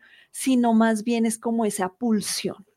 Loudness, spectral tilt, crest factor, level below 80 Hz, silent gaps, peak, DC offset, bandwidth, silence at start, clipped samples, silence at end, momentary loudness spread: -23 LUFS; -4.5 dB/octave; 14 dB; -68 dBFS; none; -10 dBFS; under 0.1%; 16 kHz; 0.35 s; under 0.1%; 0.2 s; 8 LU